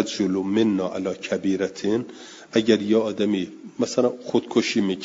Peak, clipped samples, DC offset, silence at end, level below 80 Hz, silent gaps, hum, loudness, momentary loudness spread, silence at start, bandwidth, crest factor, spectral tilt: -4 dBFS; under 0.1%; under 0.1%; 0 s; -66 dBFS; none; none; -23 LUFS; 8 LU; 0 s; 7.8 kHz; 20 dB; -5 dB/octave